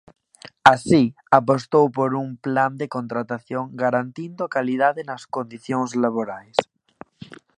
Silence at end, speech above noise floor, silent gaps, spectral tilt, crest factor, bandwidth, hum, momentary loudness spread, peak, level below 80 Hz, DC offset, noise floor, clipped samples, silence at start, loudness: 0.25 s; 26 dB; none; -6 dB/octave; 22 dB; 11 kHz; none; 13 LU; 0 dBFS; -60 dBFS; under 0.1%; -47 dBFS; under 0.1%; 0.65 s; -21 LUFS